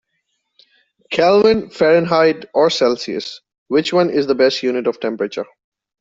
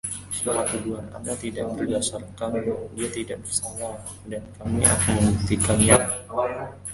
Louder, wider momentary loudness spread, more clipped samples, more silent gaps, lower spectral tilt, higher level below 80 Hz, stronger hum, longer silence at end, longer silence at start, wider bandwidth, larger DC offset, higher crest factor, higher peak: first, -16 LUFS vs -24 LUFS; second, 11 LU vs 15 LU; neither; first, 3.58-3.66 s vs none; about the same, -5 dB/octave vs -4 dB/octave; second, -56 dBFS vs -40 dBFS; neither; first, 0.55 s vs 0 s; first, 1.1 s vs 0.05 s; second, 7.8 kHz vs 12 kHz; neither; second, 14 dB vs 24 dB; about the same, -2 dBFS vs 0 dBFS